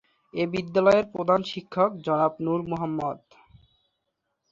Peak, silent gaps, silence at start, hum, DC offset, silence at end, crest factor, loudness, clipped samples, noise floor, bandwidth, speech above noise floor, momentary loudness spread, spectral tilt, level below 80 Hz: -6 dBFS; none; 0.35 s; none; under 0.1%; 1.35 s; 20 dB; -25 LUFS; under 0.1%; -79 dBFS; 7.6 kHz; 55 dB; 11 LU; -7 dB/octave; -62 dBFS